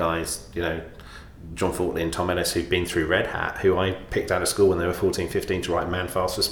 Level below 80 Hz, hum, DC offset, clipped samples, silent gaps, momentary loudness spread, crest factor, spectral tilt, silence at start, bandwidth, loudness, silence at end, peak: -42 dBFS; none; under 0.1%; under 0.1%; none; 9 LU; 18 dB; -4.5 dB/octave; 0 s; 19 kHz; -25 LUFS; 0 s; -8 dBFS